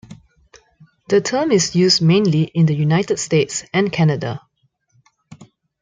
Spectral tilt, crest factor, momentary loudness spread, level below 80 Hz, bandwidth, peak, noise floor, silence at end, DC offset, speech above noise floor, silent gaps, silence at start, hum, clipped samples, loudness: -5 dB/octave; 16 dB; 6 LU; -56 dBFS; 9.4 kHz; -2 dBFS; -65 dBFS; 0.35 s; under 0.1%; 49 dB; none; 0.1 s; none; under 0.1%; -17 LUFS